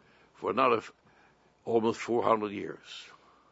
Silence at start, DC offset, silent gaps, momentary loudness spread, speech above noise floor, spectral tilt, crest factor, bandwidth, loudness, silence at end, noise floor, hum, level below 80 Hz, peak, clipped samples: 0.4 s; under 0.1%; none; 19 LU; 34 dB; -5.5 dB/octave; 22 dB; 8 kHz; -30 LUFS; 0.45 s; -64 dBFS; none; -76 dBFS; -10 dBFS; under 0.1%